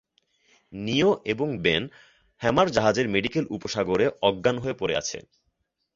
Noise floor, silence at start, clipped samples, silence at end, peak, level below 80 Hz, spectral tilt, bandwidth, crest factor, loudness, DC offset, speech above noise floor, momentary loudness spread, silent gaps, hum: -75 dBFS; 0.7 s; under 0.1%; 0.75 s; -6 dBFS; -54 dBFS; -4.5 dB/octave; 7.8 kHz; 20 dB; -25 LUFS; under 0.1%; 51 dB; 10 LU; none; none